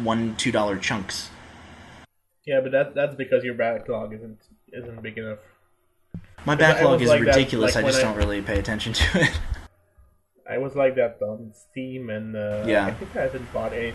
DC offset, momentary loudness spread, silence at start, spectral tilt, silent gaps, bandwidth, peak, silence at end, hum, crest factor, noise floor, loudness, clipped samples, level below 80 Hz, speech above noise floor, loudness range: under 0.1%; 21 LU; 0 s; -5 dB/octave; none; 12 kHz; -2 dBFS; 0 s; none; 22 dB; -64 dBFS; -23 LUFS; under 0.1%; -40 dBFS; 42 dB; 8 LU